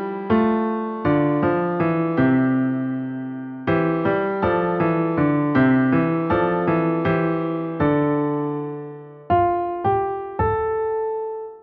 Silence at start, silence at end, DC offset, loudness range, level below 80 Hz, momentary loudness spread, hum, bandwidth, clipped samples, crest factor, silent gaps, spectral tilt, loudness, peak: 0 s; 0 s; under 0.1%; 3 LU; -46 dBFS; 9 LU; none; 5 kHz; under 0.1%; 14 dB; none; -11 dB/octave; -21 LUFS; -6 dBFS